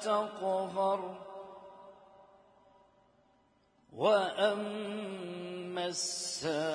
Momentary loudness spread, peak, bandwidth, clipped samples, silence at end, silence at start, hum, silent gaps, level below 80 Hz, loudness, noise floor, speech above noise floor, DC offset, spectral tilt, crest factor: 21 LU; -16 dBFS; 10.5 kHz; under 0.1%; 0 s; 0 s; none; none; -80 dBFS; -34 LUFS; -69 dBFS; 36 dB; under 0.1%; -3 dB/octave; 20 dB